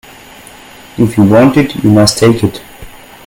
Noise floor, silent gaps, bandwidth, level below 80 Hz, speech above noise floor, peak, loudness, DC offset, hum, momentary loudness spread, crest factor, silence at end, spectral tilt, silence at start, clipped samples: -34 dBFS; none; 17.5 kHz; -38 dBFS; 26 dB; 0 dBFS; -9 LUFS; under 0.1%; none; 12 LU; 10 dB; 0.35 s; -6 dB/octave; 0.95 s; 0.3%